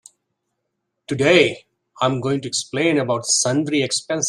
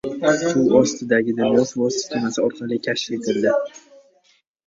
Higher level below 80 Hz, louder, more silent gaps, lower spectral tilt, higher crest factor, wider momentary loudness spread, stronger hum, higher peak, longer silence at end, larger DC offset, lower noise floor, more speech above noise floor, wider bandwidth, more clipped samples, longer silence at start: about the same, -60 dBFS vs -60 dBFS; about the same, -19 LUFS vs -20 LUFS; neither; about the same, -3.5 dB/octave vs -4.5 dB/octave; about the same, 20 dB vs 18 dB; about the same, 8 LU vs 7 LU; neither; about the same, -2 dBFS vs -2 dBFS; second, 0 s vs 0.9 s; neither; first, -76 dBFS vs -61 dBFS; first, 57 dB vs 41 dB; first, 12.5 kHz vs 7.8 kHz; neither; first, 1.1 s vs 0.05 s